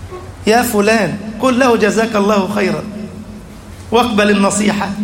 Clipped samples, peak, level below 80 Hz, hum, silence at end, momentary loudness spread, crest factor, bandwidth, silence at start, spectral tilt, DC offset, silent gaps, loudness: under 0.1%; 0 dBFS; -42 dBFS; none; 0 s; 19 LU; 14 dB; 16.5 kHz; 0 s; -4.5 dB/octave; under 0.1%; none; -13 LUFS